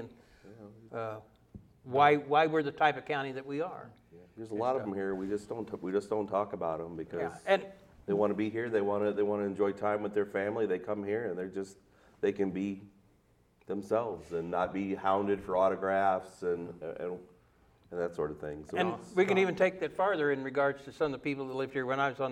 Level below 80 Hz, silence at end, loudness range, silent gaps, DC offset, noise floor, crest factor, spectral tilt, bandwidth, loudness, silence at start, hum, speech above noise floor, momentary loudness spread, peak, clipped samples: -66 dBFS; 0 s; 5 LU; none; under 0.1%; -67 dBFS; 22 dB; -6.5 dB/octave; 11 kHz; -32 LUFS; 0 s; none; 35 dB; 13 LU; -10 dBFS; under 0.1%